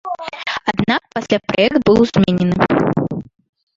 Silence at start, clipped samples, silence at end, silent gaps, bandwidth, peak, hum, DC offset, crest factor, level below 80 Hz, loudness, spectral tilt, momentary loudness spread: 0.05 s; under 0.1%; 0.55 s; none; 7.6 kHz; 0 dBFS; none; under 0.1%; 16 dB; -44 dBFS; -16 LUFS; -6.5 dB/octave; 11 LU